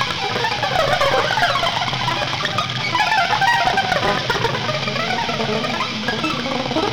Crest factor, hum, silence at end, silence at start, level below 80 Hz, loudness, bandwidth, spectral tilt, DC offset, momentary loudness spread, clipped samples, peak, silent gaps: 14 dB; none; 0 s; 0 s; -44 dBFS; -18 LUFS; over 20 kHz; -3.5 dB/octave; under 0.1%; 5 LU; under 0.1%; -6 dBFS; none